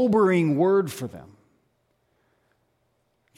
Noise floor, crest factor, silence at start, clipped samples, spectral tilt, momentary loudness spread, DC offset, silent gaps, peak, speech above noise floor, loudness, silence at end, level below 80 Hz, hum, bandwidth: -71 dBFS; 16 dB; 0 s; under 0.1%; -7.5 dB/octave; 16 LU; under 0.1%; none; -10 dBFS; 49 dB; -21 LUFS; 2.15 s; -66 dBFS; none; 16 kHz